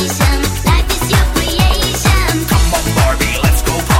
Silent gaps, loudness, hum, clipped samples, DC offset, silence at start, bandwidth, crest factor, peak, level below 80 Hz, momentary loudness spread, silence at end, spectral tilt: none; -13 LUFS; none; under 0.1%; under 0.1%; 0 s; 17 kHz; 12 dB; 0 dBFS; -16 dBFS; 1 LU; 0 s; -4 dB/octave